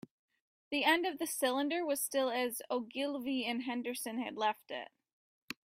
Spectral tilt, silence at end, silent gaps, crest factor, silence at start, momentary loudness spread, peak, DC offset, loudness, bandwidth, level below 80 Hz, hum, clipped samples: -1.5 dB/octave; 0.1 s; 5.13-5.48 s; 20 dB; 0.7 s; 11 LU; -16 dBFS; under 0.1%; -35 LUFS; 16 kHz; -82 dBFS; none; under 0.1%